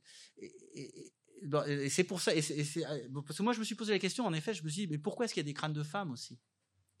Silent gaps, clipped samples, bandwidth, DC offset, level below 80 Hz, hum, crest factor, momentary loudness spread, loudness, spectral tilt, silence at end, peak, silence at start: none; under 0.1%; 16 kHz; under 0.1%; -90 dBFS; none; 22 dB; 18 LU; -36 LUFS; -4.5 dB/octave; 0.65 s; -14 dBFS; 0.1 s